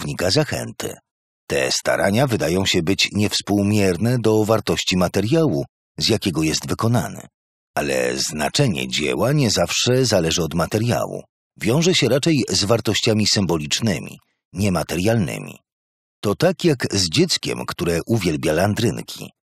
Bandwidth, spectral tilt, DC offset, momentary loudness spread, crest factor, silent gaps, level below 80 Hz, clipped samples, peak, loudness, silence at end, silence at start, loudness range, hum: 15 kHz; -4.5 dB/octave; under 0.1%; 9 LU; 18 dB; 1.11-1.47 s, 5.69-5.95 s, 7.34-7.74 s, 11.29-11.51 s, 14.45-14.51 s, 15.72-16.23 s; -46 dBFS; under 0.1%; -2 dBFS; -19 LUFS; 0.3 s; 0 s; 3 LU; none